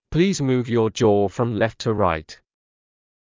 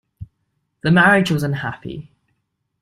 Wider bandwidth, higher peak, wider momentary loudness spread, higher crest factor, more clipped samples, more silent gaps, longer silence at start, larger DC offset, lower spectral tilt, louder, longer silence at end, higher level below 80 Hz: second, 7.6 kHz vs 14 kHz; second, -6 dBFS vs -2 dBFS; second, 4 LU vs 20 LU; about the same, 16 dB vs 18 dB; neither; neither; about the same, 0.1 s vs 0.2 s; neither; about the same, -6.5 dB/octave vs -6.5 dB/octave; second, -21 LUFS vs -16 LUFS; first, 0.95 s vs 0.8 s; first, -44 dBFS vs -52 dBFS